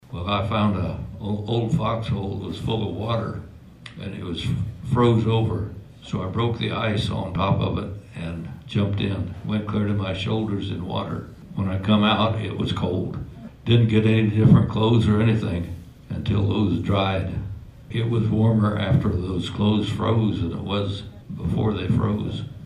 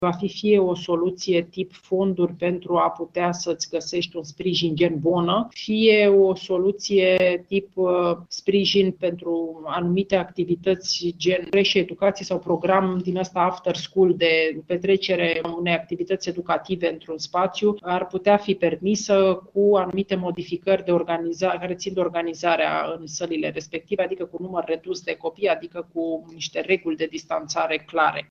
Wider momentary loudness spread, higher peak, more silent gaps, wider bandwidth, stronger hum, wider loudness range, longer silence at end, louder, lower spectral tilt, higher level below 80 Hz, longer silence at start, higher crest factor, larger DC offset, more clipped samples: first, 14 LU vs 9 LU; about the same, -4 dBFS vs -4 dBFS; neither; first, 10.5 kHz vs 7.4 kHz; neither; about the same, 6 LU vs 6 LU; about the same, 0 s vs 0.05 s; about the same, -23 LUFS vs -23 LUFS; first, -8 dB/octave vs -5 dB/octave; first, -42 dBFS vs -62 dBFS; about the same, 0.1 s vs 0 s; about the same, 18 dB vs 18 dB; neither; neither